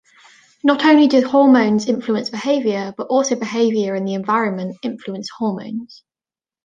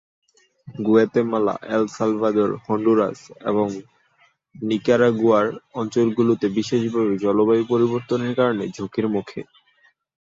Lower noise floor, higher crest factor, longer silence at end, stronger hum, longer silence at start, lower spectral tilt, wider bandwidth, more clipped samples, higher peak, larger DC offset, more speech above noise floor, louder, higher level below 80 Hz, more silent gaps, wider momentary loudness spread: first, under -90 dBFS vs -61 dBFS; about the same, 16 dB vs 18 dB; about the same, 0.8 s vs 0.8 s; neither; about the same, 0.65 s vs 0.65 s; second, -5 dB/octave vs -7 dB/octave; first, 9 kHz vs 7.8 kHz; neither; about the same, -2 dBFS vs -4 dBFS; neither; first, over 73 dB vs 41 dB; first, -17 LUFS vs -21 LUFS; about the same, -66 dBFS vs -62 dBFS; neither; first, 15 LU vs 10 LU